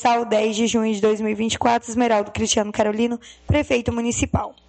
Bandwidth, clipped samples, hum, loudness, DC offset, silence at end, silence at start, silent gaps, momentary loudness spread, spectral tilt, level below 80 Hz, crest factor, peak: 9 kHz; under 0.1%; none; -21 LUFS; under 0.1%; 0.2 s; 0 s; none; 4 LU; -4.5 dB/octave; -40 dBFS; 16 dB; -4 dBFS